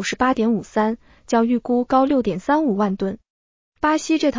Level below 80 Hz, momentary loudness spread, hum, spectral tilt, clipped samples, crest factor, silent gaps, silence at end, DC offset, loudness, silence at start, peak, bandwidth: -52 dBFS; 7 LU; none; -5.5 dB/octave; under 0.1%; 14 dB; 3.30-3.72 s; 0 s; under 0.1%; -20 LUFS; 0 s; -6 dBFS; 7.6 kHz